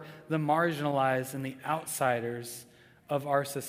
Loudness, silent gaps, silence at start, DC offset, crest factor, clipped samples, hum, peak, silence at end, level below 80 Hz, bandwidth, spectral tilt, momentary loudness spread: -31 LUFS; none; 0 s; under 0.1%; 18 dB; under 0.1%; none; -12 dBFS; 0 s; -74 dBFS; 16 kHz; -5 dB/octave; 10 LU